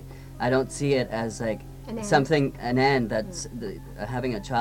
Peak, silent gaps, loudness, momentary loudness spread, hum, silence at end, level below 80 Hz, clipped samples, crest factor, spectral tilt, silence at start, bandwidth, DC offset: -6 dBFS; none; -26 LUFS; 14 LU; none; 0 s; -46 dBFS; under 0.1%; 20 dB; -5.5 dB/octave; 0 s; 17 kHz; under 0.1%